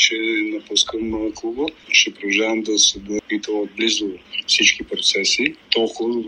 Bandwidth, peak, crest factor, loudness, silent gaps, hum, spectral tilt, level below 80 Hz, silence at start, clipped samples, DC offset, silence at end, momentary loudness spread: 10.5 kHz; 0 dBFS; 20 dB; -18 LUFS; none; none; -0.5 dB/octave; -52 dBFS; 0 s; under 0.1%; under 0.1%; 0 s; 10 LU